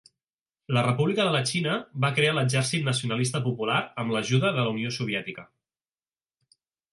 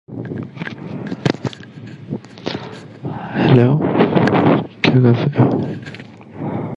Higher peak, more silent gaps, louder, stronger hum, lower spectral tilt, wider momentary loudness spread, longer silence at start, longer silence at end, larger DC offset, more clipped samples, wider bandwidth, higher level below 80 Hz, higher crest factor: second, -10 dBFS vs 0 dBFS; neither; second, -26 LUFS vs -16 LUFS; neither; second, -5 dB/octave vs -8 dB/octave; second, 6 LU vs 20 LU; first, 0.7 s vs 0.1 s; first, 1.5 s vs 0 s; neither; neither; first, 11.5 kHz vs 7.6 kHz; second, -68 dBFS vs -48 dBFS; about the same, 18 dB vs 18 dB